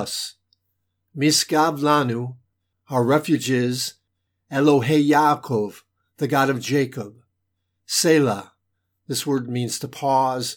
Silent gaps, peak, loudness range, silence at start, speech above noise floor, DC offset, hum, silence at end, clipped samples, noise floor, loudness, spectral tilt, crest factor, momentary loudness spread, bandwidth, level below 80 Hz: none; -4 dBFS; 3 LU; 0 s; 55 dB; under 0.1%; none; 0 s; under 0.1%; -75 dBFS; -21 LUFS; -4.5 dB/octave; 18 dB; 12 LU; 19.5 kHz; -74 dBFS